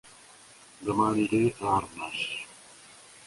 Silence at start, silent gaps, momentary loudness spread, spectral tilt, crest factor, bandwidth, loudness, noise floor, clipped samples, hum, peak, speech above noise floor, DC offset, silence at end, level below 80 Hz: 0.05 s; none; 24 LU; -5 dB/octave; 18 dB; 11.5 kHz; -28 LUFS; -53 dBFS; under 0.1%; none; -12 dBFS; 26 dB; under 0.1%; 0.05 s; -58 dBFS